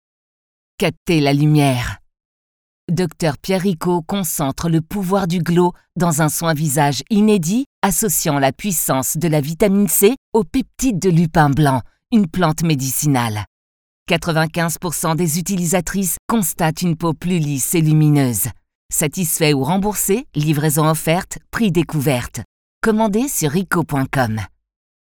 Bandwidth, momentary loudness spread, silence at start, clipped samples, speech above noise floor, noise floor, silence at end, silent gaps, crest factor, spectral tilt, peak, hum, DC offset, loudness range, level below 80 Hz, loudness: over 20 kHz; 7 LU; 0.8 s; under 0.1%; over 73 dB; under -90 dBFS; 0.7 s; 0.97-1.06 s, 2.25-2.88 s, 7.66-7.82 s, 10.18-10.32 s, 13.47-14.06 s, 16.19-16.29 s, 18.75-18.89 s, 22.45-22.81 s; 18 dB; -5 dB/octave; 0 dBFS; none; under 0.1%; 3 LU; -42 dBFS; -17 LUFS